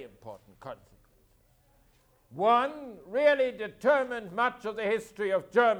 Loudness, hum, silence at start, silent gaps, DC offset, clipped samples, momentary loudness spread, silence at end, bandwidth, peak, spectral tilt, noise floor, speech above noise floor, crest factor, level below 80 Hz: -28 LUFS; none; 0 s; none; under 0.1%; under 0.1%; 21 LU; 0 s; 14 kHz; -12 dBFS; -5 dB/octave; -65 dBFS; 37 dB; 18 dB; -68 dBFS